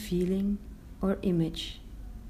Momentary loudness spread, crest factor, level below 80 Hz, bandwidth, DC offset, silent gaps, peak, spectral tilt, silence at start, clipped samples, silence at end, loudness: 17 LU; 16 dB; -44 dBFS; 15.5 kHz; under 0.1%; none; -16 dBFS; -7 dB/octave; 0 s; under 0.1%; 0 s; -31 LUFS